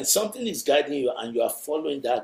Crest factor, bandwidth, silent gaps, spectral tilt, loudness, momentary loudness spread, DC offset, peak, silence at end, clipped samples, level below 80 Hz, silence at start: 18 dB; 16 kHz; none; -2 dB/octave; -25 LUFS; 6 LU; under 0.1%; -6 dBFS; 0 s; under 0.1%; -70 dBFS; 0 s